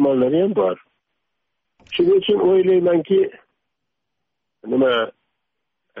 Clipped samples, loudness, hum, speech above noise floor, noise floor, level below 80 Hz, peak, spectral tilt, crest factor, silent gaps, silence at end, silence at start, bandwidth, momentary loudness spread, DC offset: under 0.1%; -18 LUFS; none; 63 dB; -80 dBFS; -64 dBFS; -8 dBFS; -4.5 dB/octave; 12 dB; none; 0 s; 0 s; 3.9 kHz; 9 LU; under 0.1%